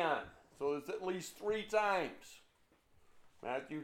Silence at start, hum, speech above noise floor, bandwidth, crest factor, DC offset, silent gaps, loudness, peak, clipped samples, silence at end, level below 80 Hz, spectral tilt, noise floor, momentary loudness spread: 0 s; none; 33 dB; 16.5 kHz; 20 dB; under 0.1%; none; -39 LUFS; -20 dBFS; under 0.1%; 0 s; -72 dBFS; -4 dB/octave; -71 dBFS; 17 LU